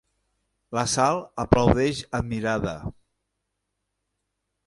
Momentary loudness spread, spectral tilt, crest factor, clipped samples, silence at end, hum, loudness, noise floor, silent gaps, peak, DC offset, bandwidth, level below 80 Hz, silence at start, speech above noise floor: 12 LU; -5 dB/octave; 24 dB; under 0.1%; 1.75 s; none; -24 LUFS; -80 dBFS; none; -2 dBFS; under 0.1%; 11.5 kHz; -42 dBFS; 0.7 s; 56 dB